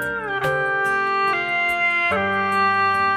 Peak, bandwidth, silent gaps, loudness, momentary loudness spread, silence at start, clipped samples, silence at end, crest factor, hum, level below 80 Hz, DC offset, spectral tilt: -8 dBFS; 15.5 kHz; none; -19 LUFS; 4 LU; 0 s; under 0.1%; 0 s; 12 dB; none; -56 dBFS; under 0.1%; -4.5 dB/octave